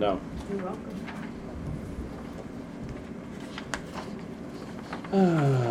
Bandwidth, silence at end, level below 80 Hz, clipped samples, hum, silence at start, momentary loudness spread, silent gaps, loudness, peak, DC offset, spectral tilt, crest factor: 13 kHz; 0 s; -48 dBFS; under 0.1%; none; 0 s; 15 LU; none; -32 LUFS; -10 dBFS; under 0.1%; -7 dB/octave; 22 dB